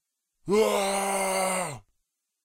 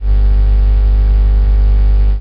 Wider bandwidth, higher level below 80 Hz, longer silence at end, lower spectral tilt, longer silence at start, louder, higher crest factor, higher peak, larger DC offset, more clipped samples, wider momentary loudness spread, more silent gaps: first, 16 kHz vs 3.1 kHz; second, -60 dBFS vs -8 dBFS; first, 0.65 s vs 0 s; second, -3 dB/octave vs -8.5 dB/octave; first, 0.45 s vs 0 s; second, -26 LUFS vs -13 LUFS; first, 16 dB vs 6 dB; second, -12 dBFS vs -4 dBFS; neither; neither; first, 15 LU vs 0 LU; neither